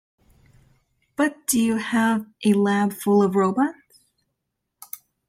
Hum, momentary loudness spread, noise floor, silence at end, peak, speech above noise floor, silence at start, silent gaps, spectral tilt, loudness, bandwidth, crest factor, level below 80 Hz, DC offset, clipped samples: none; 17 LU; -79 dBFS; 1.55 s; -6 dBFS; 59 dB; 1.2 s; none; -5 dB/octave; -21 LUFS; 16 kHz; 18 dB; -66 dBFS; under 0.1%; under 0.1%